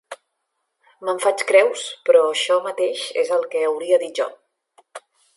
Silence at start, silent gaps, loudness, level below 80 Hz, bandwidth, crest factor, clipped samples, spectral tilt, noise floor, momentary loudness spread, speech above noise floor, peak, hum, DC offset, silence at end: 0.1 s; none; -20 LUFS; -82 dBFS; 11.5 kHz; 18 dB; under 0.1%; -1 dB/octave; -75 dBFS; 11 LU; 56 dB; -2 dBFS; none; under 0.1%; 0.4 s